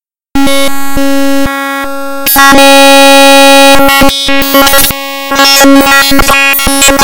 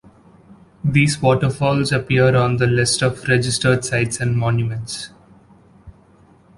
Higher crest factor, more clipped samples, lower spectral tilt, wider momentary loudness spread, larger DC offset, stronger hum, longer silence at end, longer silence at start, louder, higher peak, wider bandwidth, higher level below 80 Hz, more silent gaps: second, 4 dB vs 16 dB; first, 20% vs under 0.1%; second, -2 dB/octave vs -5 dB/octave; first, 12 LU vs 9 LU; neither; neither; second, 0 s vs 0.65 s; second, 0 s vs 0.85 s; first, -4 LUFS vs -18 LUFS; about the same, 0 dBFS vs -2 dBFS; first, over 20 kHz vs 11.5 kHz; first, -24 dBFS vs -46 dBFS; neither